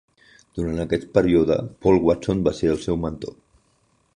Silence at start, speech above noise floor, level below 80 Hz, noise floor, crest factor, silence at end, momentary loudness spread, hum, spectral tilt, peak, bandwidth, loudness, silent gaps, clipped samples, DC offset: 0.55 s; 43 dB; -42 dBFS; -64 dBFS; 20 dB; 0.85 s; 12 LU; none; -7.5 dB/octave; -2 dBFS; 10.5 kHz; -21 LUFS; none; under 0.1%; under 0.1%